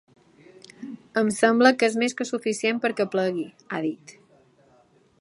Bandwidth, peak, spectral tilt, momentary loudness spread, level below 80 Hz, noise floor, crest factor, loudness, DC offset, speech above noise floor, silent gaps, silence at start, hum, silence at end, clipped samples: 11.5 kHz; -2 dBFS; -4 dB/octave; 19 LU; -74 dBFS; -60 dBFS; 22 dB; -23 LUFS; under 0.1%; 36 dB; none; 0.8 s; none; 1.1 s; under 0.1%